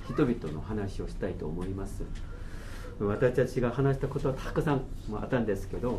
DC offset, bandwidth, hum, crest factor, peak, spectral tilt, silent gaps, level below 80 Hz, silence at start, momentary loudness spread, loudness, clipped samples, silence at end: under 0.1%; 13.5 kHz; none; 18 dB; -12 dBFS; -7.5 dB/octave; none; -40 dBFS; 0 s; 15 LU; -31 LUFS; under 0.1%; 0 s